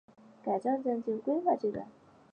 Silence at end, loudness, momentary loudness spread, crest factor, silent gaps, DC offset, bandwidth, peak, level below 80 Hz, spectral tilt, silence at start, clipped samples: 0.45 s; -33 LUFS; 12 LU; 16 dB; none; under 0.1%; 9 kHz; -16 dBFS; -74 dBFS; -8.5 dB/octave; 0.45 s; under 0.1%